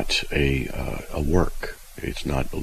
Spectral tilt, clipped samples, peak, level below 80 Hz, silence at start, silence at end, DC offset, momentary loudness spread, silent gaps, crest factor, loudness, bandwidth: -5 dB/octave; under 0.1%; -6 dBFS; -30 dBFS; 0 s; 0 s; under 0.1%; 11 LU; none; 20 dB; -26 LUFS; 14.5 kHz